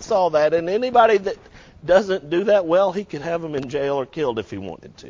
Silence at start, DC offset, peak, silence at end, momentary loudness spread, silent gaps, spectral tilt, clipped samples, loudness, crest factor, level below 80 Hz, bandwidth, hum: 0 s; under 0.1%; -4 dBFS; 0 s; 15 LU; none; -5.5 dB/octave; under 0.1%; -20 LUFS; 16 dB; -52 dBFS; 7.6 kHz; none